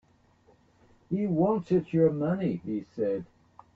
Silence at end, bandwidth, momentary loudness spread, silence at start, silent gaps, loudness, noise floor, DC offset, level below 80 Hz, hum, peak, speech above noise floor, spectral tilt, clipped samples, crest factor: 0.5 s; 7 kHz; 10 LU; 1.1 s; none; -28 LUFS; -63 dBFS; under 0.1%; -62 dBFS; none; -12 dBFS; 36 dB; -10.5 dB/octave; under 0.1%; 18 dB